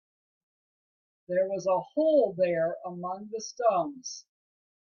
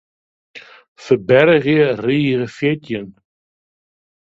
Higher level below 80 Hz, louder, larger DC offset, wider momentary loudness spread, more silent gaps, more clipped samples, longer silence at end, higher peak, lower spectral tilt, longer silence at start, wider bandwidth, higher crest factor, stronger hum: second, -78 dBFS vs -58 dBFS; second, -28 LUFS vs -15 LUFS; neither; about the same, 13 LU vs 12 LU; second, none vs 0.88-0.96 s; neither; second, 0.7 s vs 1.25 s; second, -14 dBFS vs 0 dBFS; second, -5 dB/octave vs -7.5 dB/octave; first, 1.3 s vs 0.55 s; second, 7 kHz vs 7.8 kHz; about the same, 18 dB vs 18 dB; neither